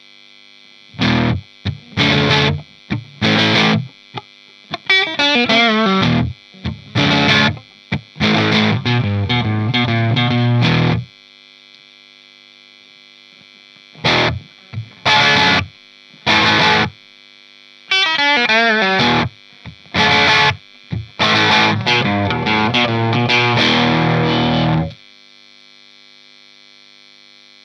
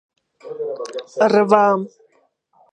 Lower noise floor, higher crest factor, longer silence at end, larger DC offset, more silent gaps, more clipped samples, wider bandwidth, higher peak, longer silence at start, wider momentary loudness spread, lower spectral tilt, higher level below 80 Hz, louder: second, -45 dBFS vs -62 dBFS; about the same, 16 dB vs 20 dB; first, 2.7 s vs 0.85 s; neither; neither; neither; about the same, 9.8 kHz vs 10 kHz; about the same, 0 dBFS vs 0 dBFS; first, 0.95 s vs 0.45 s; about the same, 16 LU vs 18 LU; about the same, -5 dB/octave vs -6 dB/octave; first, -44 dBFS vs -70 dBFS; first, -14 LUFS vs -18 LUFS